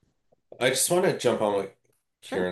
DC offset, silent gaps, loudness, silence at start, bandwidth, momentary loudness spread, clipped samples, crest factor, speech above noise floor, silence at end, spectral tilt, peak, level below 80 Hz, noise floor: under 0.1%; none; -25 LUFS; 0.6 s; 12.5 kHz; 10 LU; under 0.1%; 18 dB; 44 dB; 0 s; -3.5 dB/octave; -8 dBFS; -74 dBFS; -69 dBFS